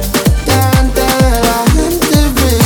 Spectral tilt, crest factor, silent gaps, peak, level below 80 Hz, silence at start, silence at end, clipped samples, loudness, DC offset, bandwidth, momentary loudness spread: -5 dB/octave; 10 dB; none; 0 dBFS; -16 dBFS; 0 s; 0 s; under 0.1%; -11 LUFS; under 0.1%; over 20 kHz; 2 LU